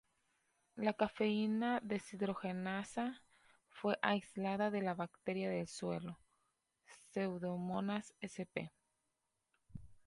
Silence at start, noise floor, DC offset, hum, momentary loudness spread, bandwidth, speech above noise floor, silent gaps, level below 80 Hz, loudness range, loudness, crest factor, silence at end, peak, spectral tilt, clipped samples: 0.75 s; -86 dBFS; under 0.1%; none; 14 LU; 11.5 kHz; 47 dB; none; -74 dBFS; 5 LU; -40 LUFS; 24 dB; 0.15 s; -18 dBFS; -6 dB/octave; under 0.1%